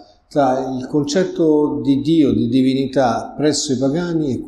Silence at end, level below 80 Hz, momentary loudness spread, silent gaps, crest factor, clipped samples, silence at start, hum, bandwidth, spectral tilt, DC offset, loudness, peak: 0 s; -48 dBFS; 5 LU; none; 12 dB; under 0.1%; 0 s; none; 11 kHz; -5.5 dB/octave; under 0.1%; -17 LUFS; -4 dBFS